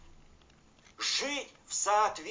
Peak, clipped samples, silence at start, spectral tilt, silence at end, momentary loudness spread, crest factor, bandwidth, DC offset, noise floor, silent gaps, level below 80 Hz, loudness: -16 dBFS; under 0.1%; 0.05 s; 0 dB/octave; 0 s; 8 LU; 18 dB; 7.8 kHz; under 0.1%; -61 dBFS; none; -64 dBFS; -31 LUFS